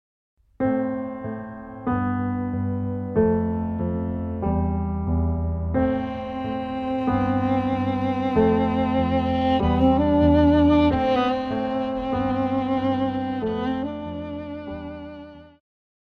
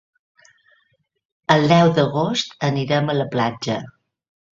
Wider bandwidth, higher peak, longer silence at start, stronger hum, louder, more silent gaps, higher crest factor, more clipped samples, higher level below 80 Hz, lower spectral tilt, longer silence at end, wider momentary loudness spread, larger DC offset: second, 6.2 kHz vs 7.6 kHz; second, -6 dBFS vs 0 dBFS; second, 0.6 s vs 1.5 s; neither; second, -23 LUFS vs -19 LUFS; neither; about the same, 16 dB vs 20 dB; neither; first, -36 dBFS vs -58 dBFS; first, -9.5 dB/octave vs -6 dB/octave; about the same, 0.6 s vs 0.7 s; about the same, 13 LU vs 12 LU; neither